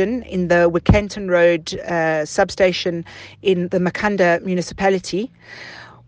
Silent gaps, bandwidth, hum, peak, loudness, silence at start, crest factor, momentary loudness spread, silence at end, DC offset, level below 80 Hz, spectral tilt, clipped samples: none; 9.6 kHz; none; 0 dBFS; -18 LUFS; 0 s; 18 dB; 15 LU; 0.2 s; under 0.1%; -36 dBFS; -5.5 dB/octave; under 0.1%